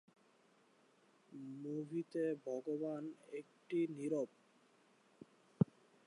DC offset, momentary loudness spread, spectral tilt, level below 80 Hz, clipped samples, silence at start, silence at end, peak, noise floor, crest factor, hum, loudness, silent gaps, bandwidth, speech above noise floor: under 0.1%; 12 LU; -8.5 dB/octave; -78 dBFS; under 0.1%; 1.3 s; 0.4 s; -18 dBFS; -72 dBFS; 26 dB; none; -43 LUFS; none; 11 kHz; 30 dB